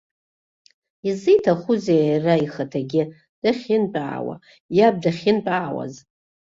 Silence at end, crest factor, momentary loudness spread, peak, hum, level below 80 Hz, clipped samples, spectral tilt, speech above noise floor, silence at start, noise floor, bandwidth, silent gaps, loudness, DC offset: 0.6 s; 18 dB; 13 LU; -4 dBFS; none; -64 dBFS; under 0.1%; -7 dB/octave; over 70 dB; 1.05 s; under -90 dBFS; 7.8 kHz; 3.29-3.42 s, 4.60-4.69 s; -21 LUFS; under 0.1%